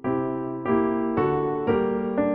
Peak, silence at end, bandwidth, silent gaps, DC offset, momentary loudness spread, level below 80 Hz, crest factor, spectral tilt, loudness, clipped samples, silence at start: -10 dBFS; 0 s; 4 kHz; none; under 0.1%; 4 LU; -50 dBFS; 14 dB; -7.5 dB/octave; -25 LUFS; under 0.1%; 0.05 s